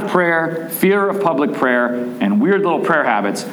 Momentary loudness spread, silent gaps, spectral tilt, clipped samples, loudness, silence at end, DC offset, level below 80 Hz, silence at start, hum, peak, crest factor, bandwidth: 4 LU; none; -6 dB/octave; under 0.1%; -16 LUFS; 0 s; under 0.1%; -70 dBFS; 0 s; none; -2 dBFS; 14 dB; over 20 kHz